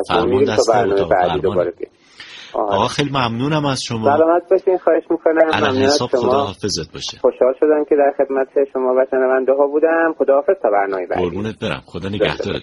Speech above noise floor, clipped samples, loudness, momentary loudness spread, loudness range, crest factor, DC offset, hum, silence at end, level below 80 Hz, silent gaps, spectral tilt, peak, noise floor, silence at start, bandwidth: 22 dB; under 0.1%; -17 LUFS; 9 LU; 2 LU; 16 dB; under 0.1%; none; 0 s; -48 dBFS; none; -5 dB/octave; 0 dBFS; -38 dBFS; 0 s; 11.5 kHz